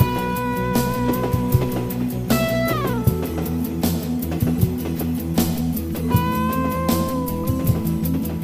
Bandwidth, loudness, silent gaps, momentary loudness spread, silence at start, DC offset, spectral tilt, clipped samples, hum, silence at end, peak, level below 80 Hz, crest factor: 15.5 kHz; -22 LUFS; none; 4 LU; 0 s; under 0.1%; -6.5 dB/octave; under 0.1%; none; 0 s; -2 dBFS; -34 dBFS; 20 dB